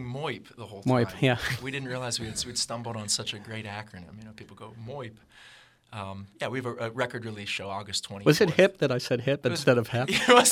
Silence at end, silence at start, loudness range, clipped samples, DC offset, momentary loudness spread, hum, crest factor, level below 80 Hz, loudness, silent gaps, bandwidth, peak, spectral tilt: 0 s; 0 s; 12 LU; under 0.1%; under 0.1%; 21 LU; none; 24 dB; -60 dBFS; -27 LUFS; none; 16 kHz; -4 dBFS; -4 dB/octave